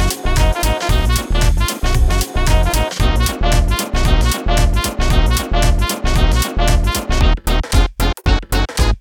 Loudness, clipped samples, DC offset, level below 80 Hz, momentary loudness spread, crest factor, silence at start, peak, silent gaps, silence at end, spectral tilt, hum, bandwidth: -17 LUFS; under 0.1%; under 0.1%; -16 dBFS; 2 LU; 14 dB; 0 s; 0 dBFS; none; 0 s; -4.5 dB/octave; none; 19 kHz